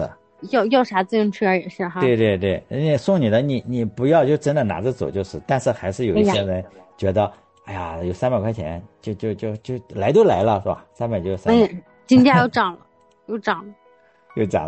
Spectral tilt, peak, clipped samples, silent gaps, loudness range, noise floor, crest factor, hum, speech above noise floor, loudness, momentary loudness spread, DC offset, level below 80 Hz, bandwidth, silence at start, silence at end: -7 dB/octave; -2 dBFS; under 0.1%; none; 5 LU; -55 dBFS; 18 dB; none; 35 dB; -20 LUFS; 13 LU; under 0.1%; -50 dBFS; 8.8 kHz; 0 s; 0 s